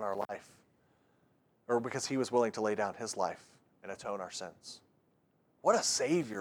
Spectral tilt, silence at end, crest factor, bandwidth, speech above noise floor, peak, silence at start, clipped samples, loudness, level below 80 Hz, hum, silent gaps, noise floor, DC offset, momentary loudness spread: -3.5 dB/octave; 0 s; 22 dB; over 20 kHz; 38 dB; -14 dBFS; 0 s; under 0.1%; -34 LUFS; -82 dBFS; none; none; -73 dBFS; under 0.1%; 21 LU